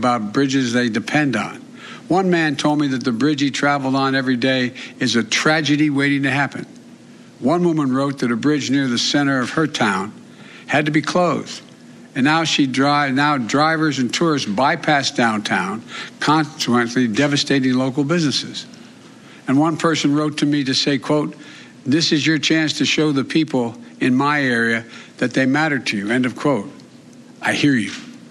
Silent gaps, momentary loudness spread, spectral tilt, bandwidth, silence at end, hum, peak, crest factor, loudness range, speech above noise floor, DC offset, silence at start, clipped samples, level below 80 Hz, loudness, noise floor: none; 9 LU; -4.5 dB/octave; 11.5 kHz; 0 s; none; -2 dBFS; 16 dB; 2 LU; 25 dB; under 0.1%; 0 s; under 0.1%; -64 dBFS; -18 LUFS; -42 dBFS